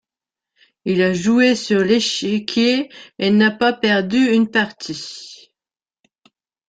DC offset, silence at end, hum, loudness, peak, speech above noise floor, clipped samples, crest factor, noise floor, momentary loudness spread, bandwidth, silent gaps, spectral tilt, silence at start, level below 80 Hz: under 0.1%; 1.35 s; none; -17 LUFS; -2 dBFS; over 73 dB; under 0.1%; 16 dB; under -90 dBFS; 14 LU; 9.2 kHz; none; -4.5 dB/octave; 0.85 s; -60 dBFS